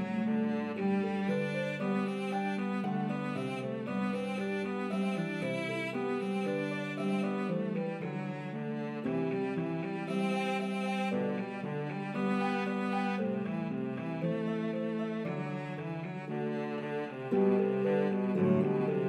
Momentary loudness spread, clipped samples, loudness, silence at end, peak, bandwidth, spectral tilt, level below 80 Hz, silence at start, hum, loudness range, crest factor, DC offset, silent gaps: 7 LU; under 0.1%; -34 LUFS; 0 s; -16 dBFS; 11 kHz; -7.5 dB/octave; -82 dBFS; 0 s; none; 2 LU; 16 dB; under 0.1%; none